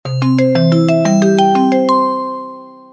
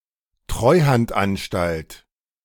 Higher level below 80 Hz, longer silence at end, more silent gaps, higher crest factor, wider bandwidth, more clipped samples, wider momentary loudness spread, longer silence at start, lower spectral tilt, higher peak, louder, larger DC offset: second, -58 dBFS vs -40 dBFS; second, 0.2 s vs 0.5 s; neither; second, 12 dB vs 18 dB; second, 8 kHz vs 18 kHz; neither; second, 11 LU vs 15 LU; second, 0.05 s vs 0.5 s; about the same, -7 dB/octave vs -6.5 dB/octave; first, 0 dBFS vs -4 dBFS; first, -12 LUFS vs -20 LUFS; neither